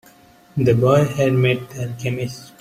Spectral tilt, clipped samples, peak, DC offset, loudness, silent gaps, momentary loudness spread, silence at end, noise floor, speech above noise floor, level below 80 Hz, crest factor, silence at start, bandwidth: -7 dB/octave; under 0.1%; -2 dBFS; under 0.1%; -19 LUFS; none; 14 LU; 0.15 s; -49 dBFS; 31 dB; -50 dBFS; 16 dB; 0.55 s; 15 kHz